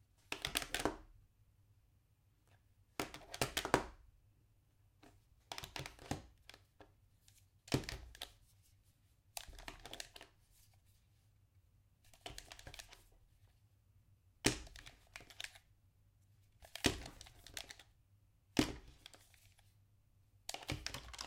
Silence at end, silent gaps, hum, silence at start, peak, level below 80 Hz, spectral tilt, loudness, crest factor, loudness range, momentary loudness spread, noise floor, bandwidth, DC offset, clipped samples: 0 s; none; none; 0.3 s; -10 dBFS; -62 dBFS; -3 dB/octave; -44 LUFS; 38 dB; 12 LU; 21 LU; -74 dBFS; 16.5 kHz; under 0.1%; under 0.1%